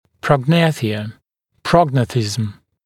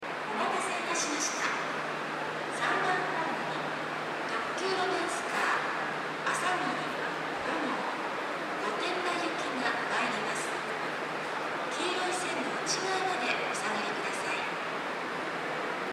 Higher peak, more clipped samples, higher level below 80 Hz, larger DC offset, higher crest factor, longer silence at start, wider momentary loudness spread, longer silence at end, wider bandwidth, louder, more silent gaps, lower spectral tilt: first, 0 dBFS vs -16 dBFS; neither; first, -50 dBFS vs -76 dBFS; neither; about the same, 18 dB vs 16 dB; first, 0.25 s vs 0 s; first, 13 LU vs 5 LU; first, 0.3 s vs 0 s; second, 14.5 kHz vs 16 kHz; first, -17 LUFS vs -31 LUFS; neither; first, -6 dB/octave vs -2.5 dB/octave